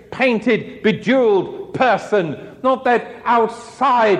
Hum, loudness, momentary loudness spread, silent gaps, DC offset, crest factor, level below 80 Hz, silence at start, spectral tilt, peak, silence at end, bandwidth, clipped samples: none; -18 LUFS; 6 LU; none; under 0.1%; 14 dB; -58 dBFS; 0.1 s; -6 dB/octave; -4 dBFS; 0 s; 10 kHz; under 0.1%